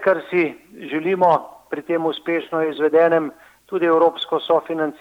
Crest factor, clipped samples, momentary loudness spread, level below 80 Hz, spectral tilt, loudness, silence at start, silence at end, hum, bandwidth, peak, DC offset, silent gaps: 16 dB; under 0.1%; 12 LU; -70 dBFS; -6.5 dB/octave; -19 LUFS; 0 s; 0.1 s; none; 7.2 kHz; -2 dBFS; under 0.1%; none